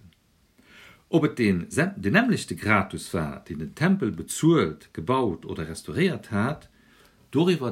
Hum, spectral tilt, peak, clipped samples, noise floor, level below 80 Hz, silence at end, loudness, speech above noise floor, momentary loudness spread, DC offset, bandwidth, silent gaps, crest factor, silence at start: none; -6 dB/octave; -4 dBFS; under 0.1%; -62 dBFS; -54 dBFS; 0 s; -25 LUFS; 38 dB; 12 LU; under 0.1%; 16 kHz; none; 22 dB; 1.1 s